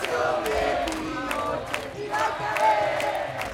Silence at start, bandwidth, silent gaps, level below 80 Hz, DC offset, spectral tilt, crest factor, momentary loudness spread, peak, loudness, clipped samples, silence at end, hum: 0 s; 17 kHz; none; -48 dBFS; under 0.1%; -3.5 dB/octave; 16 dB; 8 LU; -10 dBFS; -26 LUFS; under 0.1%; 0 s; none